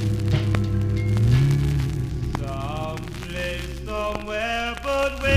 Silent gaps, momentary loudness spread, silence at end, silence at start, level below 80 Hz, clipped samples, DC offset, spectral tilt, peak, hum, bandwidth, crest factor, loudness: none; 10 LU; 0 s; 0 s; -32 dBFS; under 0.1%; 0.2%; -6.5 dB/octave; -4 dBFS; none; 15 kHz; 18 dB; -24 LUFS